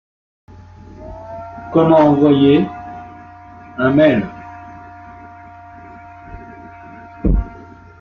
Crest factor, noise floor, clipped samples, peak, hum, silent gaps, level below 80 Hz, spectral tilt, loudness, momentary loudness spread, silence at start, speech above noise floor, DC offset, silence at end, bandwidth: 16 dB; -39 dBFS; under 0.1%; -2 dBFS; none; none; -30 dBFS; -9 dB/octave; -14 LUFS; 27 LU; 1 s; 27 dB; under 0.1%; 0.45 s; 6.2 kHz